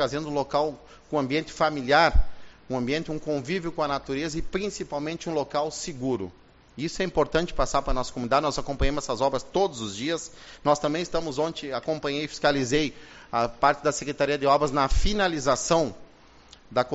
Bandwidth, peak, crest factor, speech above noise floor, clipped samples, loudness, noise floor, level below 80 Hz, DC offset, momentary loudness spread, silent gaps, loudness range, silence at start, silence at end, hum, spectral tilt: 8 kHz; -6 dBFS; 20 dB; 27 dB; under 0.1%; -26 LUFS; -52 dBFS; -36 dBFS; under 0.1%; 9 LU; none; 5 LU; 0 s; 0 s; none; -3.5 dB/octave